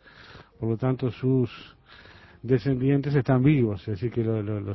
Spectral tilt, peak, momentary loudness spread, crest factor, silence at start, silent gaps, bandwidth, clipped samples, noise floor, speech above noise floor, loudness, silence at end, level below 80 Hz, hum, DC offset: -10.5 dB/octave; -8 dBFS; 10 LU; 16 dB; 0.2 s; none; 6 kHz; under 0.1%; -49 dBFS; 24 dB; -25 LUFS; 0 s; -52 dBFS; none; under 0.1%